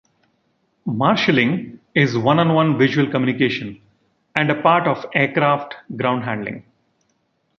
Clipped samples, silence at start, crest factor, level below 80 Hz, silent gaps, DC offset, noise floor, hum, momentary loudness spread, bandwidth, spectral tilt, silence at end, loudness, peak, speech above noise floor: under 0.1%; 0.85 s; 20 dB; -60 dBFS; none; under 0.1%; -67 dBFS; none; 11 LU; 6.8 kHz; -7 dB/octave; 1 s; -18 LUFS; 0 dBFS; 49 dB